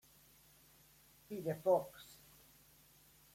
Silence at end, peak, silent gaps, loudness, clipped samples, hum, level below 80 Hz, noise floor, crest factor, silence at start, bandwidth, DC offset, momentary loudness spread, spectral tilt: 1.2 s; -22 dBFS; none; -38 LUFS; under 0.1%; none; -76 dBFS; -67 dBFS; 22 dB; 1.3 s; 16.5 kHz; under 0.1%; 27 LU; -6 dB/octave